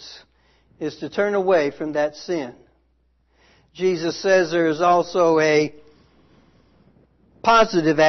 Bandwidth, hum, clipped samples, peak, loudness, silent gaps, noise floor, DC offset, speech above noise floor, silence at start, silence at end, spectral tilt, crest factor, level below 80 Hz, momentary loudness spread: 6.4 kHz; none; under 0.1%; -4 dBFS; -20 LUFS; none; -64 dBFS; under 0.1%; 45 dB; 0 s; 0 s; -5 dB/octave; 16 dB; -58 dBFS; 12 LU